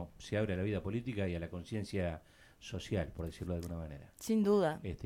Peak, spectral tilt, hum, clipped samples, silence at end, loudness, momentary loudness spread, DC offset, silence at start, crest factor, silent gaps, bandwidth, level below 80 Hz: -18 dBFS; -6.5 dB/octave; none; under 0.1%; 0 s; -37 LUFS; 15 LU; under 0.1%; 0 s; 18 dB; none; 16.5 kHz; -54 dBFS